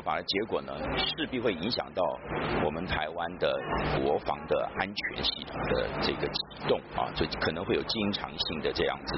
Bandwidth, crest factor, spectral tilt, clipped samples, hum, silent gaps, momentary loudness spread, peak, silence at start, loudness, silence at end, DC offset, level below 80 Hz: 6 kHz; 20 dB; -2.5 dB/octave; under 0.1%; none; none; 3 LU; -10 dBFS; 0 s; -31 LUFS; 0 s; under 0.1%; -48 dBFS